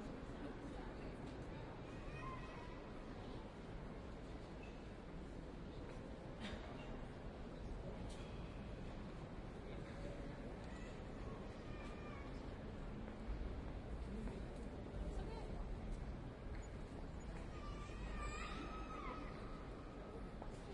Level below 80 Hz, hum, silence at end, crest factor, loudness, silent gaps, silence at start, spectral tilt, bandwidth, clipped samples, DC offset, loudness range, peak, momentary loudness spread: -54 dBFS; none; 0 s; 14 dB; -52 LUFS; none; 0 s; -6.5 dB/octave; 11 kHz; under 0.1%; under 0.1%; 2 LU; -36 dBFS; 4 LU